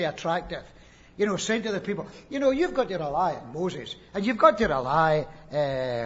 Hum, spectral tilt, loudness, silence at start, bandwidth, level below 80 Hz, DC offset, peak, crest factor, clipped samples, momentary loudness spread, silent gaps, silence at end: none; -5 dB/octave; -26 LUFS; 0 s; 8 kHz; -52 dBFS; under 0.1%; -4 dBFS; 22 dB; under 0.1%; 14 LU; none; 0 s